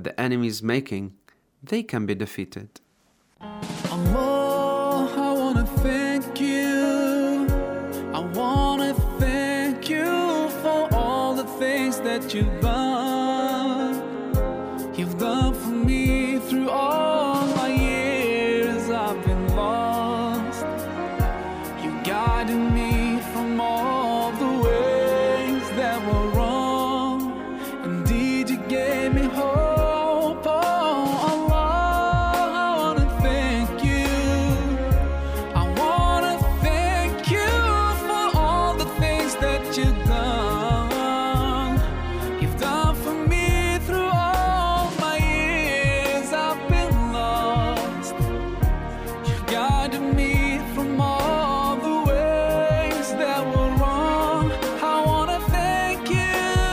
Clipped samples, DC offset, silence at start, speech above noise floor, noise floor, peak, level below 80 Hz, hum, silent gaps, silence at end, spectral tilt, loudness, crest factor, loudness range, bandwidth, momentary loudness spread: under 0.1%; under 0.1%; 0 s; 38 dB; -64 dBFS; -8 dBFS; -30 dBFS; none; none; 0 s; -5.5 dB/octave; -23 LUFS; 14 dB; 3 LU; 16 kHz; 6 LU